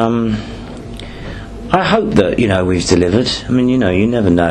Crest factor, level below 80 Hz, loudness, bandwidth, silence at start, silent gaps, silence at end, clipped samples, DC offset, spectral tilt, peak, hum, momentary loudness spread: 14 dB; -34 dBFS; -14 LUFS; 10.5 kHz; 0 s; none; 0 s; under 0.1%; under 0.1%; -6 dB/octave; 0 dBFS; none; 16 LU